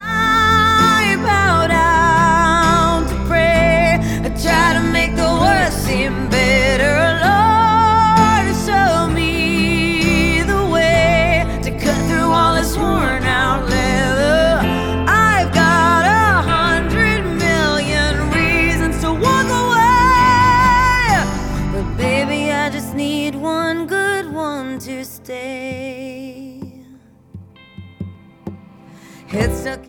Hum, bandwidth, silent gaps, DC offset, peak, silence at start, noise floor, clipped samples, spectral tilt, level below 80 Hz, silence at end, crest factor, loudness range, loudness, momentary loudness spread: none; 19 kHz; none; under 0.1%; 0 dBFS; 0 s; -45 dBFS; under 0.1%; -5 dB/octave; -26 dBFS; 0.05 s; 14 dB; 11 LU; -14 LUFS; 14 LU